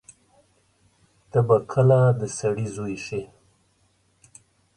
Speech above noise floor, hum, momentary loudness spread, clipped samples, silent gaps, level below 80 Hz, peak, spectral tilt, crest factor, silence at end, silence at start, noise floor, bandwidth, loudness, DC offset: 44 dB; none; 14 LU; under 0.1%; none; -58 dBFS; -6 dBFS; -7 dB/octave; 20 dB; 1.5 s; 1.35 s; -65 dBFS; 11 kHz; -22 LUFS; under 0.1%